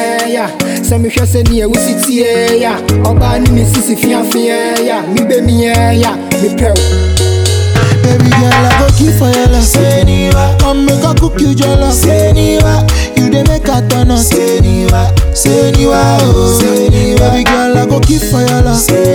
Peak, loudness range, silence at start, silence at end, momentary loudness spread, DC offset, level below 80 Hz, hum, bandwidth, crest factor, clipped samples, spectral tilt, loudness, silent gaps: 0 dBFS; 2 LU; 0 s; 0 s; 4 LU; under 0.1%; -16 dBFS; none; over 20 kHz; 8 dB; 0.1%; -5.5 dB/octave; -9 LUFS; none